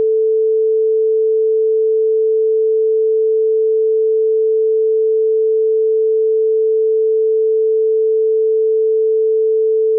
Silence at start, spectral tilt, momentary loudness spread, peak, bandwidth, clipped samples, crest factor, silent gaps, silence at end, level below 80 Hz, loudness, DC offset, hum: 0 s; -11 dB/octave; 0 LU; -10 dBFS; 0.5 kHz; under 0.1%; 4 dB; none; 0 s; under -90 dBFS; -14 LUFS; under 0.1%; none